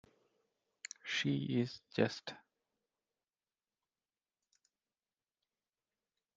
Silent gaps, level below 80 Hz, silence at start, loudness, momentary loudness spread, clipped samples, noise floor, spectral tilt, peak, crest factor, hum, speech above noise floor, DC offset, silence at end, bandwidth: none; -82 dBFS; 1.05 s; -38 LUFS; 16 LU; under 0.1%; under -90 dBFS; -5 dB/octave; -18 dBFS; 26 dB; none; over 53 dB; under 0.1%; 4 s; 8 kHz